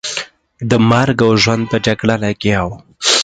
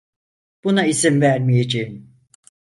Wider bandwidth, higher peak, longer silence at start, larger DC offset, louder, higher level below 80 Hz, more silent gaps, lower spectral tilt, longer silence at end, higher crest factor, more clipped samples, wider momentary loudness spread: second, 9.4 kHz vs 11.5 kHz; about the same, 0 dBFS vs -2 dBFS; second, 0.05 s vs 0.65 s; neither; first, -14 LUFS vs -18 LUFS; first, -40 dBFS vs -58 dBFS; neither; about the same, -4.5 dB/octave vs -5 dB/octave; second, 0 s vs 0.8 s; about the same, 14 dB vs 18 dB; neither; first, 13 LU vs 10 LU